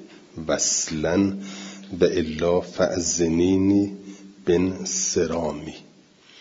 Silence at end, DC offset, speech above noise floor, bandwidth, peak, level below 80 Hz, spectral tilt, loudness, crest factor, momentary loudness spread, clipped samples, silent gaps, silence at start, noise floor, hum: 0.6 s; under 0.1%; 30 dB; 7.8 kHz; -4 dBFS; -52 dBFS; -4 dB/octave; -22 LUFS; 20 dB; 16 LU; under 0.1%; none; 0 s; -52 dBFS; none